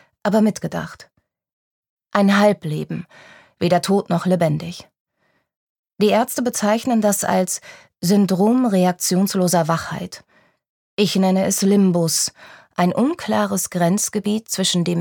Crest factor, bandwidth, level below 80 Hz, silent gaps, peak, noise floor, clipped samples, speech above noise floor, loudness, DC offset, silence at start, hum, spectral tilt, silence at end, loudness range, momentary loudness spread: 18 dB; 19 kHz; -60 dBFS; 1.53-1.83 s, 1.89-1.97 s, 5.00-5.05 s, 5.56-5.84 s, 10.69-10.97 s; -2 dBFS; -67 dBFS; under 0.1%; 49 dB; -19 LUFS; under 0.1%; 0.25 s; none; -5 dB/octave; 0 s; 3 LU; 11 LU